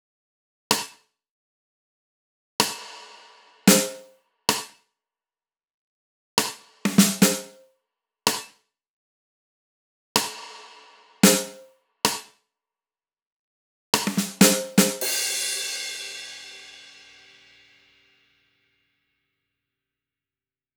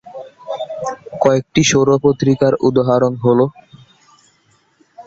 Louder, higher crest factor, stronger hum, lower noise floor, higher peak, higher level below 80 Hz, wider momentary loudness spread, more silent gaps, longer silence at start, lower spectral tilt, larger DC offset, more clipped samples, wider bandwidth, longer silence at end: second, -22 LUFS vs -15 LUFS; first, 26 dB vs 16 dB; neither; first, under -90 dBFS vs -57 dBFS; about the same, 0 dBFS vs -2 dBFS; second, -66 dBFS vs -50 dBFS; first, 22 LU vs 14 LU; first, 1.30-2.59 s, 5.74-6.37 s, 8.89-10.15 s, 13.22-13.93 s vs none; first, 0.7 s vs 0.05 s; second, -3 dB/octave vs -5.5 dB/octave; neither; neither; first, over 20 kHz vs 7.8 kHz; first, 4 s vs 0.05 s